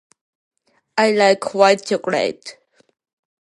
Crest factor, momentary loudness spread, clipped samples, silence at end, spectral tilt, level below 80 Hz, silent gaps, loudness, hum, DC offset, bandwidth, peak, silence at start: 20 dB; 13 LU; under 0.1%; 0.9 s; -4 dB/octave; -70 dBFS; none; -17 LUFS; none; under 0.1%; 11.5 kHz; 0 dBFS; 0.95 s